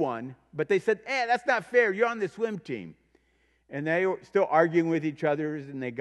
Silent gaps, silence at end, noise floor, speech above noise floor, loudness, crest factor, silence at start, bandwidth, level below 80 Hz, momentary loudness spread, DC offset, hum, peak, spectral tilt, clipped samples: none; 0 s; -69 dBFS; 41 dB; -27 LUFS; 20 dB; 0 s; 11 kHz; -72 dBFS; 14 LU; under 0.1%; none; -8 dBFS; -6.5 dB/octave; under 0.1%